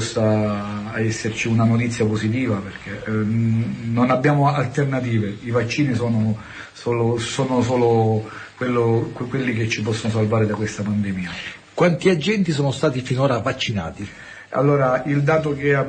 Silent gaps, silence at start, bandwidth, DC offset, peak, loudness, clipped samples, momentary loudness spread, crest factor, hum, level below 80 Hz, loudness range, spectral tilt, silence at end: none; 0 s; 9.2 kHz; under 0.1%; -6 dBFS; -21 LUFS; under 0.1%; 10 LU; 14 dB; none; -50 dBFS; 1 LU; -6.5 dB/octave; 0 s